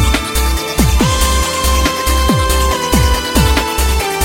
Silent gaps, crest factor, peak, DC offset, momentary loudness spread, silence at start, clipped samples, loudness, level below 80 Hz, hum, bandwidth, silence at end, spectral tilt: none; 12 dB; 0 dBFS; under 0.1%; 2 LU; 0 s; under 0.1%; -13 LUFS; -16 dBFS; none; 17 kHz; 0 s; -4 dB/octave